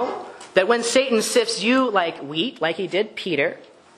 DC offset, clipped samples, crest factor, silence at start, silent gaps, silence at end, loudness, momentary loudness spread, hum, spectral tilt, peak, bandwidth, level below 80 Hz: under 0.1%; under 0.1%; 20 dB; 0 s; none; 0.35 s; -21 LUFS; 7 LU; none; -3 dB/octave; 0 dBFS; 13 kHz; -68 dBFS